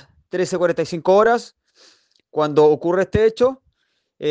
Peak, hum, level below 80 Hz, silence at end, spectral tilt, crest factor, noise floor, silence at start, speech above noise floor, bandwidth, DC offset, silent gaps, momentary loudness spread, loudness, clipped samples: -4 dBFS; none; -46 dBFS; 0 s; -6 dB/octave; 16 dB; -70 dBFS; 0.35 s; 53 dB; 9.4 kHz; under 0.1%; none; 12 LU; -18 LUFS; under 0.1%